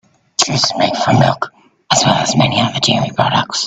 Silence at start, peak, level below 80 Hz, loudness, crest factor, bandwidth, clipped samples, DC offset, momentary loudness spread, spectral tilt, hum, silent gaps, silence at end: 0.4 s; 0 dBFS; -48 dBFS; -14 LUFS; 14 dB; 9.4 kHz; under 0.1%; under 0.1%; 4 LU; -3.5 dB/octave; none; none; 0 s